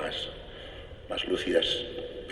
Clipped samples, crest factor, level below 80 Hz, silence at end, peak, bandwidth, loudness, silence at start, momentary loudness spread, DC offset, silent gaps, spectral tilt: under 0.1%; 22 dB; -50 dBFS; 0 s; -12 dBFS; 12 kHz; -30 LUFS; 0 s; 17 LU; under 0.1%; none; -4 dB/octave